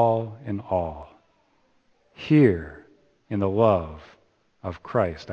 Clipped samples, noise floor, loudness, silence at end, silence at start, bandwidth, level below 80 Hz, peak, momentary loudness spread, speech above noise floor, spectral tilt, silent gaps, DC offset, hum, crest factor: under 0.1%; -65 dBFS; -24 LUFS; 0 s; 0 s; 7 kHz; -50 dBFS; -4 dBFS; 21 LU; 42 dB; -9.5 dB/octave; none; under 0.1%; none; 20 dB